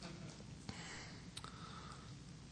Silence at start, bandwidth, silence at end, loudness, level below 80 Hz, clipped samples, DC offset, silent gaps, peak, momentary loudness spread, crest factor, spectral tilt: 0 s; 11 kHz; 0 s; -52 LUFS; -64 dBFS; under 0.1%; under 0.1%; none; -28 dBFS; 4 LU; 24 dB; -4 dB/octave